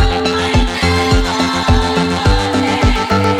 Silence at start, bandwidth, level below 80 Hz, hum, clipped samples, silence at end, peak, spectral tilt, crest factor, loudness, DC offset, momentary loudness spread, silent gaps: 0 s; 14.5 kHz; -20 dBFS; none; under 0.1%; 0 s; -2 dBFS; -5 dB/octave; 12 dB; -14 LUFS; under 0.1%; 1 LU; none